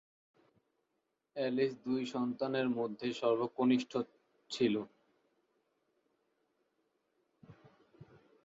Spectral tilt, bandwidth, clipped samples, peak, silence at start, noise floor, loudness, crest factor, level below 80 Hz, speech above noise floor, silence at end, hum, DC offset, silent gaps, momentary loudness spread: -4.5 dB/octave; 7.6 kHz; under 0.1%; -18 dBFS; 1.35 s; -84 dBFS; -35 LUFS; 20 dB; -80 dBFS; 50 dB; 0.4 s; none; under 0.1%; none; 10 LU